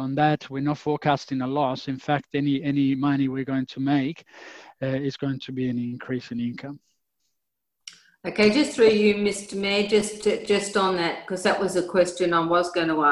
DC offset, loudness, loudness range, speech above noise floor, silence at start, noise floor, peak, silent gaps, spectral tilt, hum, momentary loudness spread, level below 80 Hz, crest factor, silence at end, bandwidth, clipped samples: under 0.1%; -24 LUFS; 9 LU; 58 dB; 0 s; -82 dBFS; -6 dBFS; none; -5.5 dB/octave; none; 11 LU; -60 dBFS; 18 dB; 0 s; 12 kHz; under 0.1%